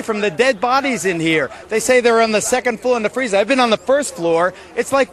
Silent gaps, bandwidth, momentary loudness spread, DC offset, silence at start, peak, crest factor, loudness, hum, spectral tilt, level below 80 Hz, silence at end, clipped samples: none; 13 kHz; 5 LU; under 0.1%; 0 s; -2 dBFS; 16 dB; -16 LUFS; none; -3.5 dB/octave; -52 dBFS; 0 s; under 0.1%